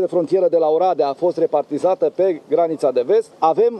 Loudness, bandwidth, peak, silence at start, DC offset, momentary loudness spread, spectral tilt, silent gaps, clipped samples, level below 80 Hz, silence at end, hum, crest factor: -18 LUFS; 9.2 kHz; -2 dBFS; 0 s; under 0.1%; 3 LU; -7 dB/octave; none; under 0.1%; -74 dBFS; 0 s; none; 14 dB